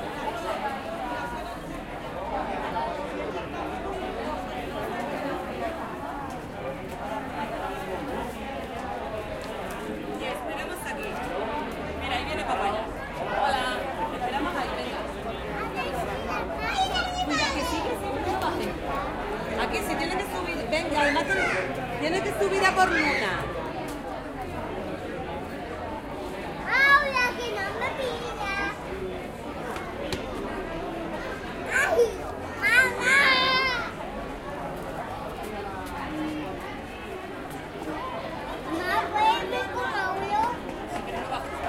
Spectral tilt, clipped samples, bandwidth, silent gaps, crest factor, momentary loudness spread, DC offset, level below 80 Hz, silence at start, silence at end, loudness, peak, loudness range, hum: -4 dB/octave; under 0.1%; 16 kHz; none; 22 dB; 12 LU; under 0.1%; -46 dBFS; 0 s; 0 s; -28 LUFS; -8 dBFS; 10 LU; none